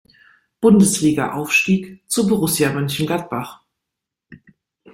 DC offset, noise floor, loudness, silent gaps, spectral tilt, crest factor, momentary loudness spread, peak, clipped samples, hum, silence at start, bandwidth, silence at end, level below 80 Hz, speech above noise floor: under 0.1%; -82 dBFS; -17 LUFS; none; -4.5 dB/octave; 18 dB; 10 LU; -2 dBFS; under 0.1%; none; 0.6 s; 16.5 kHz; 0.6 s; -52 dBFS; 65 dB